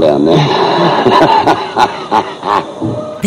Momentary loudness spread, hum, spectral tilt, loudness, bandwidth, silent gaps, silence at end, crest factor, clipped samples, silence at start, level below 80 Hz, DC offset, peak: 8 LU; none; -6 dB/octave; -11 LUFS; 14.5 kHz; none; 0 s; 10 dB; 0.3%; 0 s; -46 dBFS; under 0.1%; 0 dBFS